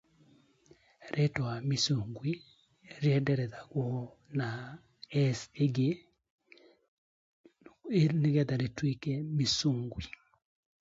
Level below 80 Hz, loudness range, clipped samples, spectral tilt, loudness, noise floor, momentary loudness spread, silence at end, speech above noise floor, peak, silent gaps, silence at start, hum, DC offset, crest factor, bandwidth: -62 dBFS; 4 LU; under 0.1%; -6 dB/octave; -32 LUFS; -65 dBFS; 14 LU; 0.75 s; 34 dB; -16 dBFS; 6.30-6.38 s, 6.88-7.44 s; 1 s; none; under 0.1%; 18 dB; 7.8 kHz